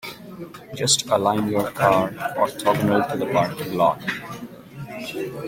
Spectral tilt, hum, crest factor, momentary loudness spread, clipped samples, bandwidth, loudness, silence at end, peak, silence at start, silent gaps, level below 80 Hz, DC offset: -4 dB/octave; none; 20 dB; 18 LU; under 0.1%; 16.5 kHz; -21 LUFS; 0 s; -2 dBFS; 0.05 s; none; -56 dBFS; under 0.1%